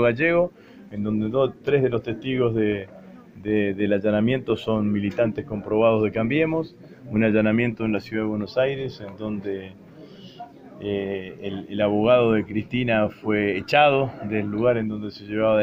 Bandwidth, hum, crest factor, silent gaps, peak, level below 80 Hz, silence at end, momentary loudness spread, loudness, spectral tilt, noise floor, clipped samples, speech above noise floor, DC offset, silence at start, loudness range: 7.4 kHz; none; 20 dB; none; -4 dBFS; -54 dBFS; 0 s; 14 LU; -23 LUFS; -8 dB/octave; -44 dBFS; under 0.1%; 21 dB; under 0.1%; 0 s; 7 LU